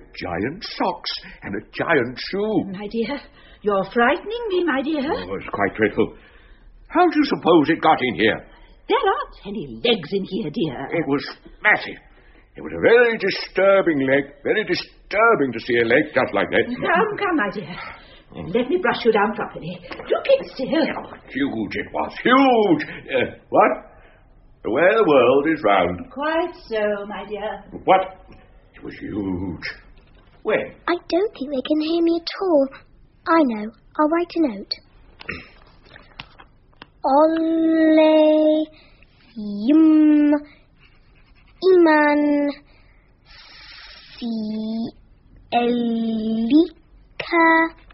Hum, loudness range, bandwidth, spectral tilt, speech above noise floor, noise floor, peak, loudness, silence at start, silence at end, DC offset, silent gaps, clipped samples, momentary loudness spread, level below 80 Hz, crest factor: none; 7 LU; 6 kHz; -3.5 dB/octave; 33 dB; -52 dBFS; 0 dBFS; -20 LUFS; 0 s; 0.2 s; under 0.1%; none; under 0.1%; 17 LU; -52 dBFS; 20 dB